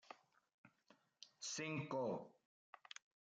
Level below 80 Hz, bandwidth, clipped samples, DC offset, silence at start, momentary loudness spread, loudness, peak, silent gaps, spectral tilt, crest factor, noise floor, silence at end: under -90 dBFS; 9.6 kHz; under 0.1%; under 0.1%; 0.1 s; 20 LU; -47 LUFS; -32 dBFS; 0.54-0.64 s; -4 dB/octave; 18 dB; -76 dBFS; 0.95 s